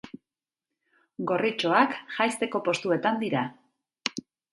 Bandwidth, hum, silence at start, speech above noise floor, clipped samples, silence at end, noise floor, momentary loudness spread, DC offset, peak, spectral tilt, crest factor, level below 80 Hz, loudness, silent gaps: 11.5 kHz; none; 0.05 s; over 64 dB; under 0.1%; 0.3 s; under -90 dBFS; 13 LU; under 0.1%; -6 dBFS; -4.5 dB/octave; 24 dB; -76 dBFS; -27 LUFS; none